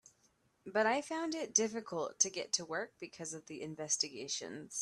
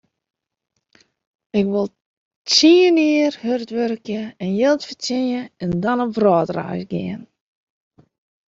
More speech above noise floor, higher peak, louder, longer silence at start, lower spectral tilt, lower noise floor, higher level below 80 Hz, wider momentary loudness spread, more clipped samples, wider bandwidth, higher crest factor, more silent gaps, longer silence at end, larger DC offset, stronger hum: second, 36 dB vs 40 dB; second, -14 dBFS vs -2 dBFS; second, -36 LUFS vs -19 LUFS; second, 0.65 s vs 1.55 s; second, -1.5 dB/octave vs -4.5 dB/octave; first, -74 dBFS vs -59 dBFS; second, -82 dBFS vs -58 dBFS; about the same, 13 LU vs 14 LU; neither; first, 13 kHz vs 7.8 kHz; first, 26 dB vs 18 dB; second, none vs 2.02-2.45 s; second, 0 s vs 1.25 s; neither; neither